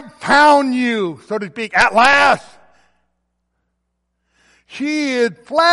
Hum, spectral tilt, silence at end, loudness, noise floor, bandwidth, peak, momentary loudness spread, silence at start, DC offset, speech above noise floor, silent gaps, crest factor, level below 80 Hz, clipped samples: none; -3.5 dB/octave; 0 s; -14 LUFS; -72 dBFS; 11.5 kHz; -2 dBFS; 13 LU; 0 s; under 0.1%; 57 dB; none; 16 dB; -54 dBFS; under 0.1%